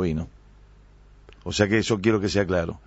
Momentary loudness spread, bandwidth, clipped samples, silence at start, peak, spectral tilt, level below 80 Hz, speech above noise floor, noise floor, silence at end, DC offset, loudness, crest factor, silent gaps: 13 LU; 8 kHz; under 0.1%; 0 s; -6 dBFS; -5.5 dB/octave; -44 dBFS; 28 dB; -51 dBFS; 0.1 s; under 0.1%; -23 LUFS; 20 dB; none